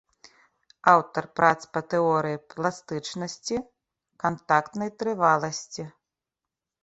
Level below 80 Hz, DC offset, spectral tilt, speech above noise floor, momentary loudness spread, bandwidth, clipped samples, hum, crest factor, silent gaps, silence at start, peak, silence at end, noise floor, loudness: -66 dBFS; under 0.1%; -4.5 dB/octave; 63 dB; 13 LU; 8.2 kHz; under 0.1%; none; 24 dB; none; 0.85 s; -4 dBFS; 0.95 s; -88 dBFS; -25 LUFS